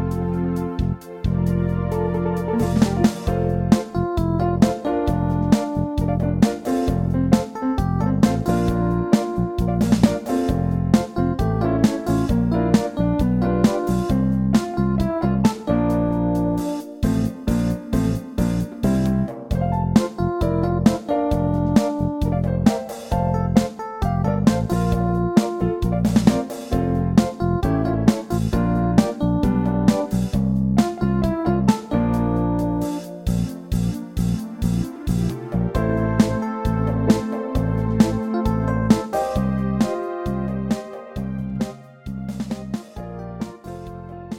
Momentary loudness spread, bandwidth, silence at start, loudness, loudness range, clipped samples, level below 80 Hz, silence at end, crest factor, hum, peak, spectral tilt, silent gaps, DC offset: 7 LU; 16.5 kHz; 0 s; -21 LUFS; 3 LU; under 0.1%; -32 dBFS; 0 s; 18 dB; none; -2 dBFS; -7.5 dB/octave; none; under 0.1%